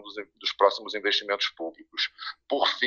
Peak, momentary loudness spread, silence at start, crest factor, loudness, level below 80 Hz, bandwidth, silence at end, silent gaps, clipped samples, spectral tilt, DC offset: -6 dBFS; 13 LU; 0 s; 22 dB; -27 LUFS; -76 dBFS; 7.2 kHz; 0 s; none; under 0.1%; -1 dB/octave; under 0.1%